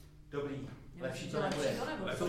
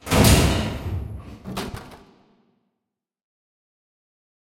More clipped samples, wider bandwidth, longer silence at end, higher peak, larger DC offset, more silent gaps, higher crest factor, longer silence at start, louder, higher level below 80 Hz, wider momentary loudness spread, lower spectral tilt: neither; about the same, 16.5 kHz vs 16.5 kHz; second, 0 s vs 2.65 s; second, -22 dBFS vs -2 dBFS; neither; neither; second, 16 dB vs 22 dB; about the same, 0 s vs 0.05 s; second, -38 LUFS vs -21 LUFS; second, -58 dBFS vs -32 dBFS; second, 10 LU vs 21 LU; about the same, -5 dB/octave vs -4.5 dB/octave